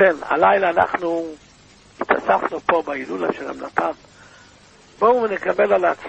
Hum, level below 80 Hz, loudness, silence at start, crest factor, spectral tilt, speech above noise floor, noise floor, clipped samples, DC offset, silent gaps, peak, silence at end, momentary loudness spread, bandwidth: 50 Hz at -60 dBFS; -58 dBFS; -20 LUFS; 0 s; 18 dB; -5.5 dB/octave; 30 dB; -49 dBFS; under 0.1%; under 0.1%; none; -2 dBFS; 0 s; 10 LU; 8.6 kHz